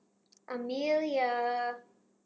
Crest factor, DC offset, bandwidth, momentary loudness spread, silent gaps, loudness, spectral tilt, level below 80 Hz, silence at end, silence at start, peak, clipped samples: 14 dB; under 0.1%; 8 kHz; 12 LU; none; -32 LUFS; -4 dB/octave; -86 dBFS; 0.45 s; 0.5 s; -18 dBFS; under 0.1%